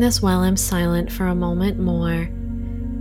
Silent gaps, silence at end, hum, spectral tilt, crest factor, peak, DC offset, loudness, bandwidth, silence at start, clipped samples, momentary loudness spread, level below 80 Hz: none; 0 s; none; -5 dB/octave; 16 dB; -4 dBFS; under 0.1%; -21 LUFS; 17 kHz; 0 s; under 0.1%; 10 LU; -30 dBFS